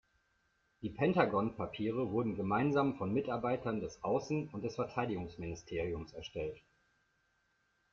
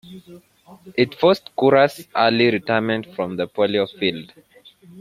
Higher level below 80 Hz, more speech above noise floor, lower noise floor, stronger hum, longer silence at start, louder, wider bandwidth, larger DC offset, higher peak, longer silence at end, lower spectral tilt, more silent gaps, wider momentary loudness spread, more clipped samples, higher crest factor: about the same, -62 dBFS vs -62 dBFS; first, 42 dB vs 28 dB; first, -77 dBFS vs -48 dBFS; neither; first, 0.8 s vs 0.1 s; second, -36 LUFS vs -19 LUFS; second, 7.2 kHz vs 15.5 kHz; neither; second, -16 dBFS vs -2 dBFS; first, 1.35 s vs 0 s; about the same, -7 dB/octave vs -6 dB/octave; neither; first, 12 LU vs 9 LU; neither; about the same, 20 dB vs 18 dB